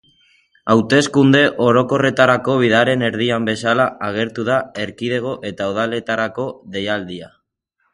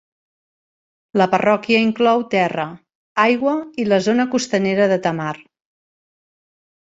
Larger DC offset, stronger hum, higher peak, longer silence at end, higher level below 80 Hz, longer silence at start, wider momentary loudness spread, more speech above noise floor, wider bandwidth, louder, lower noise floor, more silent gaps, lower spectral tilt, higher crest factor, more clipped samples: neither; neither; about the same, 0 dBFS vs -2 dBFS; second, 0.65 s vs 1.4 s; first, -54 dBFS vs -62 dBFS; second, 0.65 s vs 1.15 s; about the same, 12 LU vs 10 LU; second, 52 dB vs over 73 dB; first, 11.5 kHz vs 8 kHz; about the same, -17 LUFS vs -18 LUFS; second, -69 dBFS vs under -90 dBFS; second, none vs 2.95-3.16 s; about the same, -5.5 dB/octave vs -5.5 dB/octave; about the same, 18 dB vs 18 dB; neither